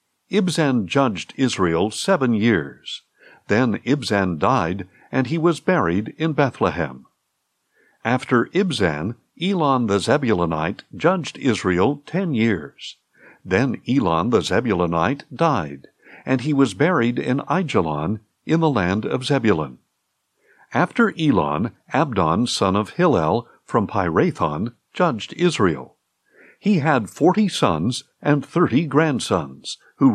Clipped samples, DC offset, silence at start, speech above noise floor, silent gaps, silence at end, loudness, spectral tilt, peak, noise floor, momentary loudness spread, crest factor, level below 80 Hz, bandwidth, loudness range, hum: under 0.1%; under 0.1%; 0.3 s; 53 dB; none; 0 s; -20 LUFS; -6 dB/octave; -4 dBFS; -73 dBFS; 8 LU; 16 dB; -56 dBFS; 13 kHz; 2 LU; none